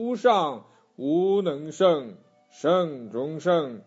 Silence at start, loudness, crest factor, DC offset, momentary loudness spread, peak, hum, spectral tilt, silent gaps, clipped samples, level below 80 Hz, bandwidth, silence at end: 0 s; -25 LUFS; 18 dB; under 0.1%; 10 LU; -8 dBFS; none; -6 dB/octave; none; under 0.1%; -78 dBFS; 8 kHz; 0.05 s